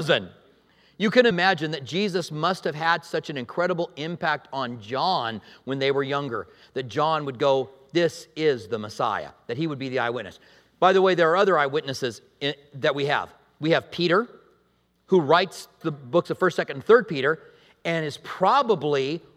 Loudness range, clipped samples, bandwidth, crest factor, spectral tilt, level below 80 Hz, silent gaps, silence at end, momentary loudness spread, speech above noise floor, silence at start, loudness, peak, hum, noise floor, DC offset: 4 LU; under 0.1%; 14 kHz; 22 dB; -5.5 dB/octave; -70 dBFS; none; 0.15 s; 13 LU; 42 dB; 0 s; -24 LUFS; -4 dBFS; none; -66 dBFS; under 0.1%